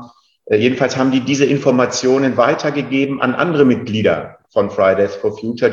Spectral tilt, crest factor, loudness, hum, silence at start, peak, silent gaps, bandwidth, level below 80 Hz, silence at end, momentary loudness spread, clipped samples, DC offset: -5.5 dB/octave; 16 dB; -16 LUFS; none; 0 s; 0 dBFS; none; 7.6 kHz; -56 dBFS; 0 s; 5 LU; under 0.1%; under 0.1%